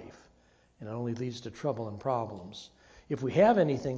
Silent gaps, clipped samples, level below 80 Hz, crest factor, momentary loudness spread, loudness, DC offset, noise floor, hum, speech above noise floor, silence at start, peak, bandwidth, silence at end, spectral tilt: none; under 0.1%; -62 dBFS; 20 dB; 22 LU; -30 LUFS; under 0.1%; -65 dBFS; none; 35 dB; 0 s; -12 dBFS; 8 kHz; 0 s; -7 dB/octave